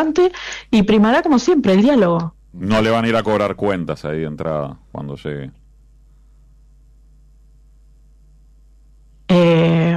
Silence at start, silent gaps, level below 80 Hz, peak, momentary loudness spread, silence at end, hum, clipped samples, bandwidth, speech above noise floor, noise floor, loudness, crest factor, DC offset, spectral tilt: 0 s; none; -44 dBFS; -6 dBFS; 16 LU; 0 s; none; under 0.1%; 10.5 kHz; 32 dB; -48 dBFS; -16 LUFS; 12 dB; under 0.1%; -7 dB/octave